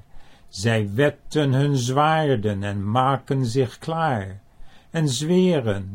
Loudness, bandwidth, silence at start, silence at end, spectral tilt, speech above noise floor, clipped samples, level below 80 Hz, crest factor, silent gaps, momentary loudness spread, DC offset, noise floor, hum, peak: -22 LUFS; 16 kHz; 0.15 s; 0 s; -6 dB/octave; 20 dB; under 0.1%; -50 dBFS; 16 dB; none; 8 LU; under 0.1%; -42 dBFS; none; -6 dBFS